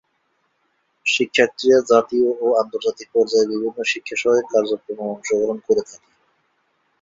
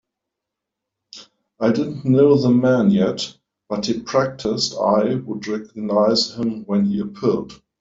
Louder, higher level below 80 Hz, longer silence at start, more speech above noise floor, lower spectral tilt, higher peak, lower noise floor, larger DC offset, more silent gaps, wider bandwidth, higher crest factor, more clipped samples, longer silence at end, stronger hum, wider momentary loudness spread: about the same, -19 LUFS vs -19 LUFS; about the same, -62 dBFS vs -58 dBFS; about the same, 1.05 s vs 1.15 s; second, 49 dB vs 64 dB; second, -3 dB/octave vs -6 dB/octave; about the same, -2 dBFS vs -4 dBFS; second, -68 dBFS vs -83 dBFS; neither; neither; about the same, 7.8 kHz vs 7.8 kHz; about the same, 18 dB vs 16 dB; neither; first, 1.2 s vs 0.25 s; neither; about the same, 9 LU vs 11 LU